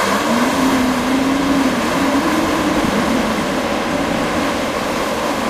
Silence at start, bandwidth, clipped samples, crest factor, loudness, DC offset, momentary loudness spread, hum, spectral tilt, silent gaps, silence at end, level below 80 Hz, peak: 0 s; 15.5 kHz; under 0.1%; 12 dB; -17 LUFS; under 0.1%; 4 LU; none; -4 dB/octave; none; 0 s; -38 dBFS; -4 dBFS